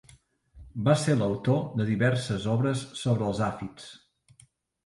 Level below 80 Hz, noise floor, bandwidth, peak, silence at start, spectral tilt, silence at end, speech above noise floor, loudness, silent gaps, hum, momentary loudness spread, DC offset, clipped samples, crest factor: -56 dBFS; -61 dBFS; 11.5 kHz; -8 dBFS; 0.55 s; -6.5 dB/octave; 0.9 s; 35 dB; -27 LUFS; none; none; 15 LU; under 0.1%; under 0.1%; 20 dB